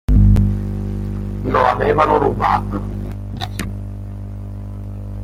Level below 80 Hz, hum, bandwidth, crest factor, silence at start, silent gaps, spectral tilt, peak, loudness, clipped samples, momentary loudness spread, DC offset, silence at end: -24 dBFS; 50 Hz at -25 dBFS; 12.5 kHz; 16 dB; 0.1 s; none; -7.5 dB/octave; -2 dBFS; -18 LUFS; under 0.1%; 16 LU; under 0.1%; 0 s